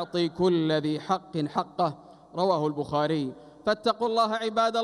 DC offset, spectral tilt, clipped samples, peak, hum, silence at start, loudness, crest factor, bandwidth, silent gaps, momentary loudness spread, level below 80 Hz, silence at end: under 0.1%; -6 dB/octave; under 0.1%; -12 dBFS; none; 0 s; -27 LUFS; 16 dB; 11.5 kHz; none; 6 LU; -64 dBFS; 0 s